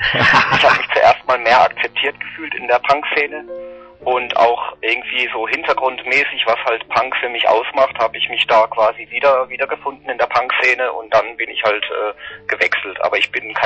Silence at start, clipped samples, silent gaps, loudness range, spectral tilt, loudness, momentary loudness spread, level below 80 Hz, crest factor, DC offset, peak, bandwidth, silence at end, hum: 0 s; under 0.1%; none; 3 LU; -3.5 dB/octave; -16 LUFS; 11 LU; -52 dBFS; 14 dB; under 0.1%; -4 dBFS; 8.4 kHz; 0 s; none